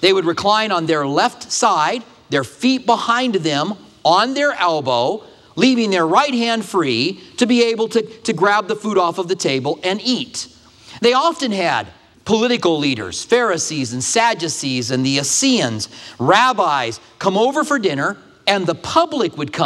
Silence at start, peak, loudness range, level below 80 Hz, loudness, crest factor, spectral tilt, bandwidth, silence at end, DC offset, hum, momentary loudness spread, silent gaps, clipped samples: 0 s; 0 dBFS; 2 LU; -60 dBFS; -17 LUFS; 18 dB; -3.5 dB/octave; 13.5 kHz; 0 s; under 0.1%; none; 7 LU; none; under 0.1%